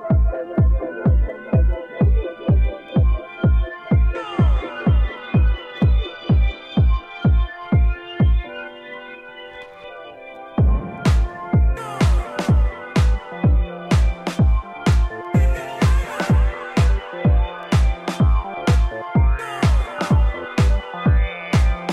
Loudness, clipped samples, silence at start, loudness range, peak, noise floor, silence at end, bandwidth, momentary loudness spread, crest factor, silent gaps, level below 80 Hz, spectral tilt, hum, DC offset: -20 LUFS; under 0.1%; 0 s; 3 LU; -6 dBFS; -37 dBFS; 0 s; 9.8 kHz; 4 LU; 12 dB; none; -20 dBFS; -7.5 dB/octave; none; under 0.1%